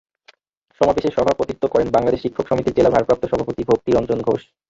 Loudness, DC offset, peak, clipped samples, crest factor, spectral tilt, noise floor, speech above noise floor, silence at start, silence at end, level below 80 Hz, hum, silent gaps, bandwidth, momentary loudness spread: -19 LUFS; under 0.1%; -2 dBFS; under 0.1%; 18 dB; -7 dB/octave; -61 dBFS; 43 dB; 0.8 s; 0.3 s; -44 dBFS; none; none; 7.8 kHz; 6 LU